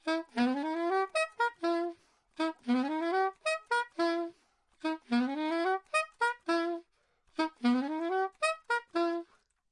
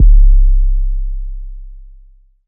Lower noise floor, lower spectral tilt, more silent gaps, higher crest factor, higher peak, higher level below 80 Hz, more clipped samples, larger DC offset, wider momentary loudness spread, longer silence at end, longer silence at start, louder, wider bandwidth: first, -72 dBFS vs -43 dBFS; second, -3 dB/octave vs -24 dB/octave; neither; first, 16 dB vs 10 dB; second, -16 dBFS vs 0 dBFS; second, -82 dBFS vs -10 dBFS; neither; neither; second, 6 LU vs 22 LU; second, 0.45 s vs 0.65 s; about the same, 0.05 s vs 0 s; second, -32 LUFS vs -16 LUFS; first, 11 kHz vs 0.3 kHz